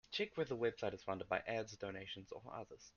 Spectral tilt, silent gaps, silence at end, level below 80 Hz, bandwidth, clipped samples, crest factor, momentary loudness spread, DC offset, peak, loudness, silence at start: -4.5 dB/octave; none; 0.05 s; -72 dBFS; 7.2 kHz; under 0.1%; 22 dB; 11 LU; under 0.1%; -22 dBFS; -44 LUFS; 0.1 s